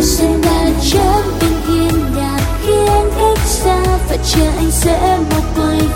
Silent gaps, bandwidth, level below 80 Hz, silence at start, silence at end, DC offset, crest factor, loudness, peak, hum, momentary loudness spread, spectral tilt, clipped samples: none; 16.5 kHz; -18 dBFS; 0 s; 0 s; under 0.1%; 12 dB; -13 LUFS; 0 dBFS; none; 3 LU; -5 dB/octave; under 0.1%